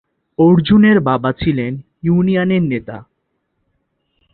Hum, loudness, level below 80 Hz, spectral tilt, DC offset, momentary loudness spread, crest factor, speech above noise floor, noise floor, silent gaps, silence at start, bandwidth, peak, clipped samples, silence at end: none; -14 LUFS; -44 dBFS; -12.5 dB/octave; under 0.1%; 15 LU; 16 dB; 56 dB; -69 dBFS; none; 0.4 s; 4.4 kHz; 0 dBFS; under 0.1%; 1.3 s